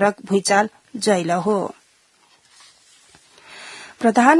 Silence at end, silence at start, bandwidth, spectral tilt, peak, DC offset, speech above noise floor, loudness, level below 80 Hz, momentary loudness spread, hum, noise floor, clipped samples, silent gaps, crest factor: 0 s; 0 s; 12 kHz; -4.5 dB/octave; 0 dBFS; under 0.1%; 40 dB; -20 LUFS; -70 dBFS; 20 LU; none; -58 dBFS; under 0.1%; none; 20 dB